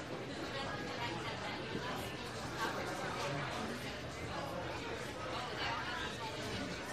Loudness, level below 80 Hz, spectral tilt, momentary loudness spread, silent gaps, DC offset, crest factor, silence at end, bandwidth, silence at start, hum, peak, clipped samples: -41 LUFS; -60 dBFS; -4 dB/octave; 4 LU; none; under 0.1%; 16 dB; 0 s; 15.5 kHz; 0 s; none; -24 dBFS; under 0.1%